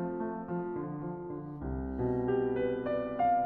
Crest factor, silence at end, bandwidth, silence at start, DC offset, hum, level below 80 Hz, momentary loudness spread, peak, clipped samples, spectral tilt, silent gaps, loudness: 14 dB; 0 s; 4.5 kHz; 0 s; under 0.1%; none; -50 dBFS; 9 LU; -18 dBFS; under 0.1%; -11 dB/octave; none; -34 LUFS